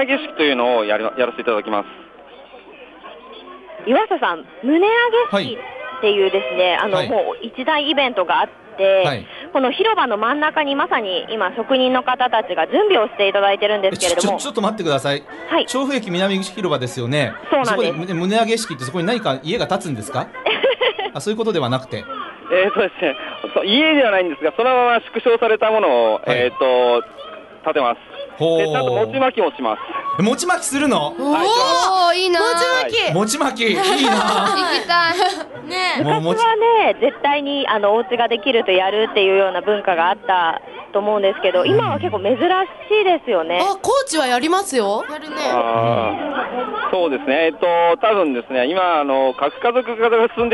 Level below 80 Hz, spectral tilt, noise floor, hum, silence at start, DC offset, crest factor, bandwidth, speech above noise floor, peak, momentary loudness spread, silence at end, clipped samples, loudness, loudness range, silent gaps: -58 dBFS; -4 dB/octave; -42 dBFS; none; 0 s; under 0.1%; 14 dB; 11.5 kHz; 24 dB; -4 dBFS; 8 LU; 0 s; under 0.1%; -17 LUFS; 4 LU; none